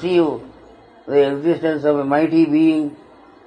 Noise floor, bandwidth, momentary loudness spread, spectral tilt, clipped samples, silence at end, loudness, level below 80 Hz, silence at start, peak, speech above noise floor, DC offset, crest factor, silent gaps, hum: -45 dBFS; 9.2 kHz; 7 LU; -8 dB/octave; under 0.1%; 0.5 s; -17 LUFS; -60 dBFS; 0 s; -4 dBFS; 29 dB; under 0.1%; 14 dB; none; none